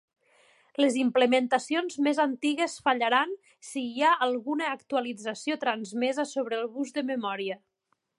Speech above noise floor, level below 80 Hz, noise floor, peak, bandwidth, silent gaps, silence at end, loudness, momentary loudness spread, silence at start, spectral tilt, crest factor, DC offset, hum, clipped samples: 49 dB; -82 dBFS; -77 dBFS; -8 dBFS; 11.5 kHz; none; 0.6 s; -28 LUFS; 10 LU; 0.8 s; -3 dB/octave; 20 dB; under 0.1%; none; under 0.1%